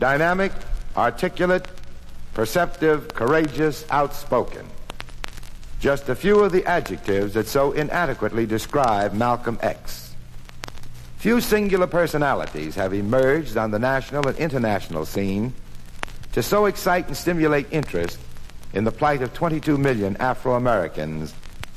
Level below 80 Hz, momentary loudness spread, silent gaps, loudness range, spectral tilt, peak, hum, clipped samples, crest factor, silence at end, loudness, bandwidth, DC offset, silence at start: -38 dBFS; 17 LU; none; 3 LU; -6 dB/octave; -2 dBFS; none; under 0.1%; 20 dB; 0 s; -22 LUFS; 15 kHz; under 0.1%; 0 s